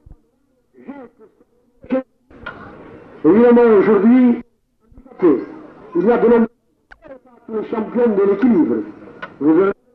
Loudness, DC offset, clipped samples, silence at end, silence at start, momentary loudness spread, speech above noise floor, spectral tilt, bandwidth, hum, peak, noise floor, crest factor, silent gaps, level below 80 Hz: -15 LUFS; under 0.1%; under 0.1%; 0.2 s; 0.9 s; 24 LU; 48 dB; -10.5 dB/octave; 4.3 kHz; none; -4 dBFS; -61 dBFS; 12 dB; none; -52 dBFS